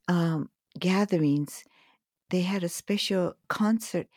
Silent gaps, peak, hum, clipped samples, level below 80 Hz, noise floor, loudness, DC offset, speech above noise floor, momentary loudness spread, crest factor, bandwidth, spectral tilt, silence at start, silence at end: none; -14 dBFS; none; under 0.1%; -72 dBFS; -66 dBFS; -28 LUFS; under 0.1%; 39 dB; 8 LU; 14 dB; 17.5 kHz; -5.5 dB/octave; 0.1 s; 0.15 s